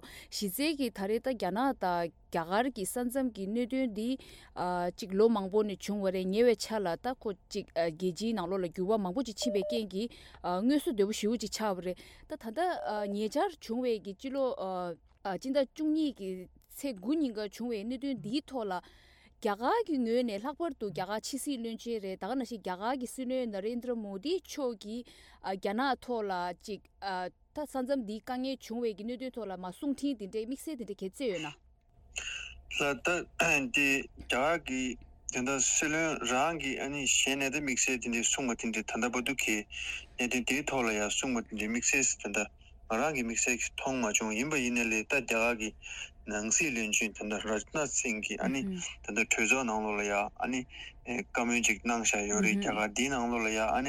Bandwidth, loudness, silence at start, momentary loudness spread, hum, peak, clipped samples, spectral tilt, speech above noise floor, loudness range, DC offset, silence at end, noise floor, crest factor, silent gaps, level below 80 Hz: 17.5 kHz; -32 LUFS; 0.05 s; 11 LU; none; -14 dBFS; under 0.1%; -3 dB/octave; 28 dB; 7 LU; under 0.1%; 0 s; -61 dBFS; 20 dB; none; -58 dBFS